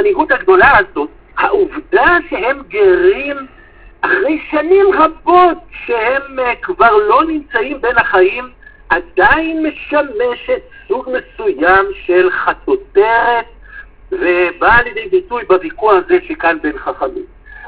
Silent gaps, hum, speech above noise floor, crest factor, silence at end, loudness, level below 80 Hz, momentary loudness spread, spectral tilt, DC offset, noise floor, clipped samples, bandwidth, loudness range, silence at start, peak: none; none; 23 dB; 12 dB; 0 s; -13 LUFS; -38 dBFS; 11 LU; -8.5 dB/octave; 0.3%; -35 dBFS; 0.2%; 4 kHz; 3 LU; 0 s; 0 dBFS